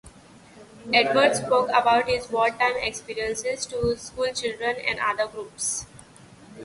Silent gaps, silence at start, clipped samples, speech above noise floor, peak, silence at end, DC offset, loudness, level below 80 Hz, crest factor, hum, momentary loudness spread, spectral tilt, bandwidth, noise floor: none; 0.05 s; under 0.1%; 26 dB; -4 dBFS; 0 s; under 0.1%; -24 LUFS; -52 dBFS; 20 dB; none; 9 LU; -2.5 dB/octave; 11.5 kHz; -50 dBFS